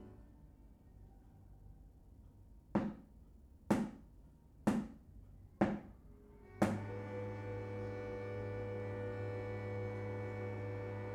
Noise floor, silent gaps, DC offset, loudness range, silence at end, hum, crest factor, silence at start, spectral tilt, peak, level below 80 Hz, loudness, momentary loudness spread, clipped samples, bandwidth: -61 dBFS; none; under 0.1%; 3 LU; 0 s; none; 26 dB; 0 s; -7.5 dB/octave; -16 dBFS; -60 dBFS; -42 LUFS; 25 LU; under 0.1%; 14.5 kHz